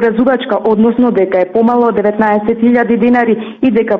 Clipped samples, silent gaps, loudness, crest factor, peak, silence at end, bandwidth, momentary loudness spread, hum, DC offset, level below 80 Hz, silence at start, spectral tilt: under 0.1%; none; -11 LUFS; 10 dB; -2 dBFS; 0 s; 4.4 kHz; 3 LU; none; under 0.1%; -48 dBFS; 0 s; -9 dB/octave